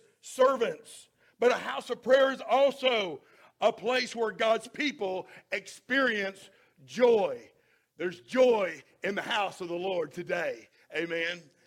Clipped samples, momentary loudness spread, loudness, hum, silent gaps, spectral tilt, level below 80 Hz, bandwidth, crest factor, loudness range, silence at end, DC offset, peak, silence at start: under 0.1%; 13 LU; -29 LUFS; none; none; -3.5 dB/octave; -78 dBFS; 14 kHz; 18 dB; 3 LU; 0.25 s; under 0.1%; -12 dBFS; 0.25 s